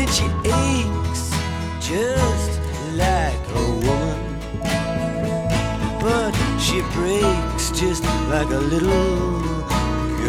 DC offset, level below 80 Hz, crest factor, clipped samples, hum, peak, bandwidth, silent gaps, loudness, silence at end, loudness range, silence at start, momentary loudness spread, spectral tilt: under 0.1%; -28 dBFS; 16 dB; under 0.1%; none; -4 dBFS; 17 kHz; none; -21 LUFS; 0 s; 2 LU; 0 s; 5 LU; -5 dB/octave